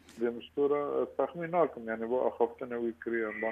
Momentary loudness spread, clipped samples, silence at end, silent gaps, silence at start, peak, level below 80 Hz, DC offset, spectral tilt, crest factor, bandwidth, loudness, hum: 6 LU; under 0.1%; 0 s; none; 0.1 s; -14 dBFS; -70 dBFS; under 0.1%; -7.5 dB/octave; 18 dB; 8.8 kHz; -33 LUFS; none